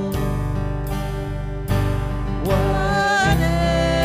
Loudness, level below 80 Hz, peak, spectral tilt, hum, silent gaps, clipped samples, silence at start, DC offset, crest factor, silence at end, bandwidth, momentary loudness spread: -21 LUFS; -26 dBFS; -6 dBFS; -6 dB/octave; none; none; under 0.1%; 0 s; under 0.1%; 14 dB; 0 s; 16 kHz; 9 LU